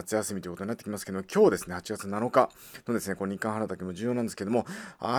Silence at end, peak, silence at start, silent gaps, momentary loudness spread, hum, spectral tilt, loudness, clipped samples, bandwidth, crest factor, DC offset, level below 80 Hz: 0 s; -6 dBFS; 0 s; none; 12 LU; none; -5.5 dB/octave; -30 LUFS; under 0.1%; over 20 kHz; 24 dB; under 0.1%; -64 dBFS